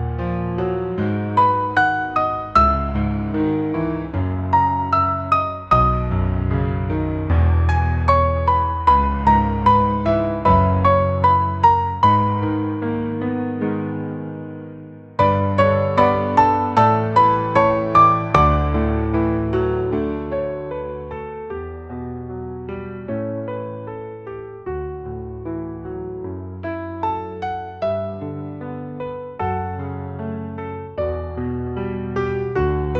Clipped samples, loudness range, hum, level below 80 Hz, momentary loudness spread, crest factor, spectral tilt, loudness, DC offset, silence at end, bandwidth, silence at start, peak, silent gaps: under 0.1%; 13 LU; none; -32 dBFS; 15 LU; 18 dB; -9 dB/octave; -19 LUFS; 0.1%; 0 s; 7.8 kHz; 0 s; 0 dBFS; none